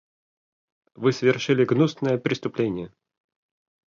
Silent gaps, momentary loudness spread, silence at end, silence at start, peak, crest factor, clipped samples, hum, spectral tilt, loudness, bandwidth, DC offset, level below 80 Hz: none; 7 LU; 1.1 s; 1 s; -6 dBFS; 20 dB; under 0.1%; none; -6.5 dB/octave; -23 LUFS; 7.4 kHz; under 0.1%; -64 dBFS